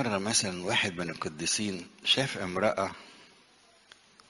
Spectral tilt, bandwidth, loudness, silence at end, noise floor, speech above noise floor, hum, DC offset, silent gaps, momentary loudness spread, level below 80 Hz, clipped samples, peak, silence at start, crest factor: -2.5 dB/octave; 11.5 kHz; -29 LUFS; 1.05 s; -61 dBFS; 30 dB; none; under 0.1%; none; 9 LU; -66 dBFS; under 0.1%; -12 dBFS; 0 s; 20 dB